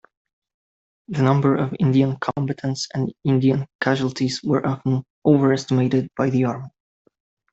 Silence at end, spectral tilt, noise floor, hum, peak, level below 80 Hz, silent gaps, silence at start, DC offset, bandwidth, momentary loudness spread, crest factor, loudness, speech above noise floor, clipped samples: 0.85 s; -7 dB/octave; under -90 dBFS; none; -4 dBFS; -58 dBFS; 3.75-3.79 s, 5.10-5.22 s; 1.1 s; under 0.1%; 8 kHz; 8 LU; 18 dB; -21 LUFS; over 70 dB; under 0.1%